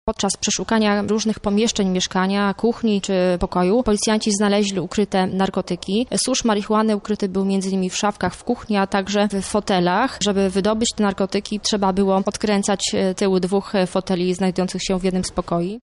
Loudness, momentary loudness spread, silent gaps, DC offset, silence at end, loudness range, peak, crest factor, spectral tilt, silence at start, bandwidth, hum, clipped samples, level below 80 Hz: -20 LUFS; 4 LU; none; under 0.1%; 0.05 s; 1 LU; -8 dBFS; 12 dB; -4.5 dB/octave; 0.05 s; 11.5 kHz; none; under 0.1%; -44 dBFS